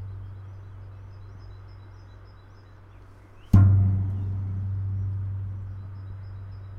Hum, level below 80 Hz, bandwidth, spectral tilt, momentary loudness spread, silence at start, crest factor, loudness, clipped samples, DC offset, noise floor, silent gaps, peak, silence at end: none; -42 dBFS; 2.2 kHz; -10 dB/octave; 26 LU; 0 s; 24 dB; -25 LUFS; under 0.1%; under 0.1%; -48 dBFS; none; -4 dBFS; 0 s